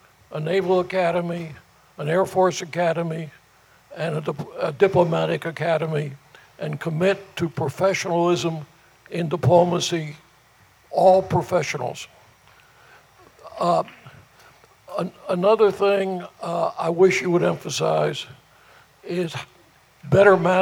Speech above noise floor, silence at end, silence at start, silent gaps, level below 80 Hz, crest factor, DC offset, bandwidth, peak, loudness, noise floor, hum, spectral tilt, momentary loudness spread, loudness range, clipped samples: 34 dB; 0 s; 0.3 s; none; -60 dBFS; 22 dB; under 0.1%; 17 kHz; 0 dBFS; -22 LUFS; -55 dBFS; none; -5.5 dB/octave; 16 LU; 4 LU; under 0.1%